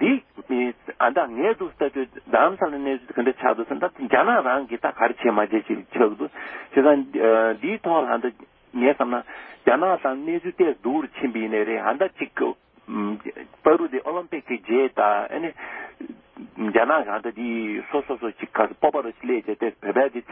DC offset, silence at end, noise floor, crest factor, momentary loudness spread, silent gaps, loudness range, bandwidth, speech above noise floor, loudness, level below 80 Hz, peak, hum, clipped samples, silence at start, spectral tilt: under 0.1%; 0 s; -42 dBFS; 22 dB; 11 LU; none; 4 LU; 3.8 kHz; 19 dB; -23 LUFS; -64 dBFS; -2 dBFS; none; under 0.1%; 0 s; -10 dB/octave